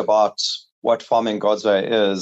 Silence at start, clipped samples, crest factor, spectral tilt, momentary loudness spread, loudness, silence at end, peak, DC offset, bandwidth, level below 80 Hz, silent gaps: 0 s; under 0.1%; 14 dB; -3.5 dB/octave; 6 LU; -20 LUFS; 0 s; -6 dBFS; under 0.1%; 8.2 kHz; -68 dBFS; 0.71-0.82 s